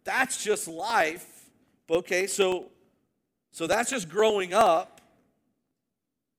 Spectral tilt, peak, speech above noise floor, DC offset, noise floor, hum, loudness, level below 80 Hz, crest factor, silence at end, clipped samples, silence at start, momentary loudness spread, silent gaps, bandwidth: -2.5 dB/octave; -8 dBFS; 59 dB; under 0.1%; -84 dBFS; none; -26 LUFS; -66 dBFS; 20 dB; 1.5 s; under 0.1%; 0.05 s; 12 LU; none; 18 kHz